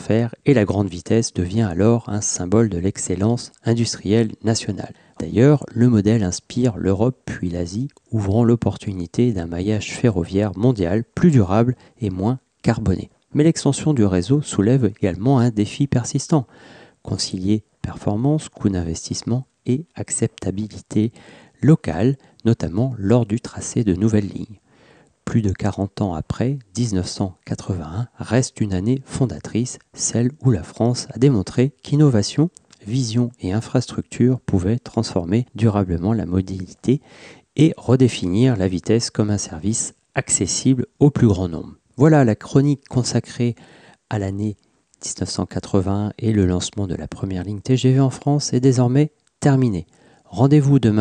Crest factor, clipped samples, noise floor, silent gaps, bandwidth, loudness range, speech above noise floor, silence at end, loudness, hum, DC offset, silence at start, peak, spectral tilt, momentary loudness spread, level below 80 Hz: 16 dB; under 0.1%; -53 dBFS; none; 10 kHz; 5 LU; 34 dB; 0 s; -20 LUFS; none; under 0.1%; 0 s; -4 dBFS; -6.5 dB/octave; 10 LU; -46 dBFS